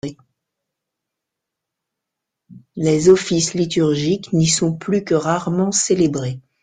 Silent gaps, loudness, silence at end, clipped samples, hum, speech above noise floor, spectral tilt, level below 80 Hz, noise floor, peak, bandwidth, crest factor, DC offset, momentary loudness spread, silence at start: none; -17 LUFS; 0.25 s; under 0.1%; none; 65 dB; -5 dB/octave; -52 dBFS; -82 dBFS; -2 dBFS; 9.6 kHz; 18 dB; under 0.1%; 9 LU; 0.05 s